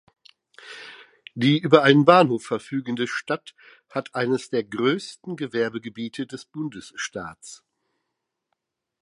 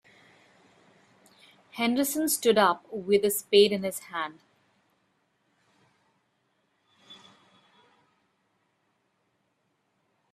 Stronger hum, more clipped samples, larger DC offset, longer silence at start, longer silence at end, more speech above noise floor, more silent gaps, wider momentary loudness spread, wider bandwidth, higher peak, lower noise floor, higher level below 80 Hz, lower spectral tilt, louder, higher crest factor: neither; neither; neither; second, 0.65 s vs 1.75 s; second, 1.45 s vs 3.2 s; first, 58 dB vs 49 dB; neither; first, 24 LU vs 13 LU; second, 11.5 kHz vs 15.5 kHz; first, 0 dBFS vs -6 dBFS; first, -81 dBFS vs -74 dBFS; first, -68 dBFS vs -76 dBFS; first, -5.5 dB/octave vs -3 dB/octave; about the same, -23 LUFS vs -25 LUFS; about the same, 24 dB vs 24 dB